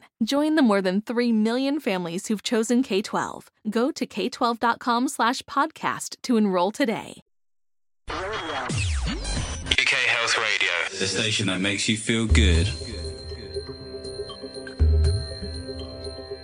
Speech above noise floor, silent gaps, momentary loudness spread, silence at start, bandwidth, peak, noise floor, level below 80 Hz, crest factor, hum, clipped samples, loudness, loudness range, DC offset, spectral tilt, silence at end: over 67 dB; 7.22-7.26 s; 15 LU; 0.2 s; 15 kHz; -4 dBFS; under -90 dBFS; -34 dBFS; 20 dB; none; under 0.1%; -24 LUFS; 5 LU; under 0.1%; -4.5 dB/octave; 0 s